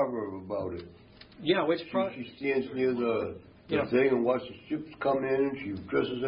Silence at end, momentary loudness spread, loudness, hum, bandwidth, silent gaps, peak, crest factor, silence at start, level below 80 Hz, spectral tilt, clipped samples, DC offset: 0 s; 11 LU; -30 LUFS; none; 5.4 kHz; none; -12 dBFS; 18 dB; 0 s; -62 dBFS; -10 dB/octave; under 0.1%; under 0.1%